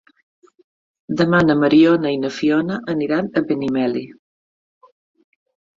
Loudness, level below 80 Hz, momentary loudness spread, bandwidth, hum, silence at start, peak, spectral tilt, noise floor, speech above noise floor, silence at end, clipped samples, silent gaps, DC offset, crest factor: -18 LUFS; -56 dBFS; 10 LU; 7.4 kHz; none; 1.1 s; -2 dBFS; -7 dB/octave; under -90 dBFS; over 73 dB; 1.65 s; under 0.1%; none; under 0.1%; 18 dB